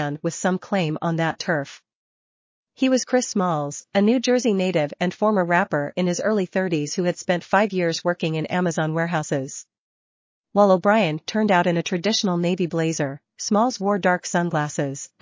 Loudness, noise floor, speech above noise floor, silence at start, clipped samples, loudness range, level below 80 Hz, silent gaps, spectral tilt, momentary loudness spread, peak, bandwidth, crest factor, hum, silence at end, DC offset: -22 LUFS; under -90 dBFS; over 68 dB; 0 s; under 0.1%; 3 LU; -70 dBFS; 1.95-2.64 s, 9.79-10.44 s; -5 dB/octave; 7 LU; -4 dBFS; 7.6 kHz; 18 dB; none; 0.15 s; under 0.1%